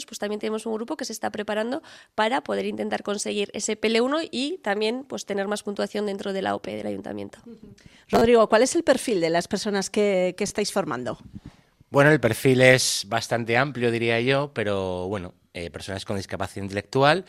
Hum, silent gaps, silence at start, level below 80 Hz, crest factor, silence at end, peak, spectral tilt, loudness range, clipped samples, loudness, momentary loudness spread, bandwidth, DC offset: none; none; 0 s; -58 dBFS; 24 dB; 0.05 s; 0 dBFS; -4.5 dB/octave; 7 LU; under 0.1%; -24 LUFS; 14 LU; 16 kHz; under 0.1%